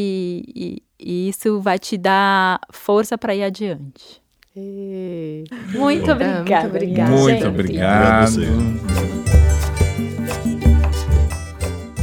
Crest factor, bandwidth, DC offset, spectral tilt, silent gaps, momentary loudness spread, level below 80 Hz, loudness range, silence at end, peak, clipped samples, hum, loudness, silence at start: 18 dB; 17 kHz; under 0.1%; -6 dB/octave; none; 15 LU; -26 dBFS; 7 LU; 0 s; 0 dBFS; under 0.1%; none; -18 LUFS; 0 s